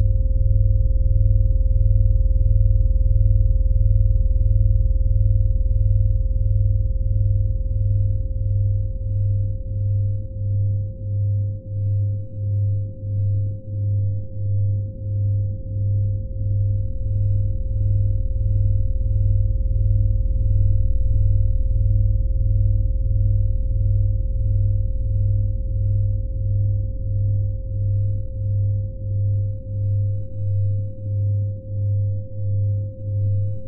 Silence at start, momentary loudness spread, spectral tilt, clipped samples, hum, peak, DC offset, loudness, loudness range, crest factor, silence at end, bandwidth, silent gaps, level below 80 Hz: 0 s; 6 LU; -20.5 dB/octave; under 0.1%; none; -6 dBFS; under 0.1%; -22 LUFS; 4 LU; 12 dB; 0 s; 0.6 kHz; none; -22 dBFS